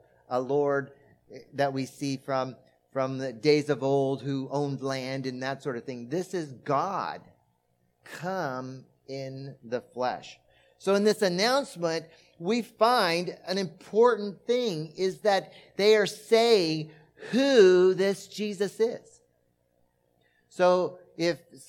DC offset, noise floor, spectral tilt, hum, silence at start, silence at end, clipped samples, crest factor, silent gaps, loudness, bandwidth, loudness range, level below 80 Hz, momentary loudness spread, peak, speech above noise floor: under 0.1%; -72 dBFS; -5 dB/octave; 60 Hz at -60 dBFS; 0.3 s; 0.05 s; under 0.1%; 20 dB; none; -27 LUFS; 16 kHz; 10 LU; -78 dBFS; 15 LU; -8 dBFS; 45 dB